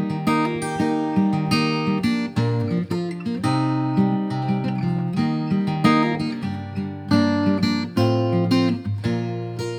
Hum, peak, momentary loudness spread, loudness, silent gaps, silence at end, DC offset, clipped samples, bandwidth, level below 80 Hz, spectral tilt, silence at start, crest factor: none; -4 dBFS; 7 LU; -22 LUFS; none; 0 s; under 0.1%; under 0.1%; 15.5 kHz; -54 dBFS; -7 dB/octave; 0 s; 18 dB